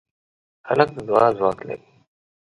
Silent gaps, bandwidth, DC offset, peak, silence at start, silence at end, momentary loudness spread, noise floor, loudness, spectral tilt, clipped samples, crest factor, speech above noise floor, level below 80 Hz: none; 10.5 kHz; under 0.1%; -2 dBFS; 0.65 s; 0.65 s; 16 LU; under -90 dBFS; -20 LUFS; -7 dB/octave; under 0.1%; 20 dB; over 70 dB; -58 dBFS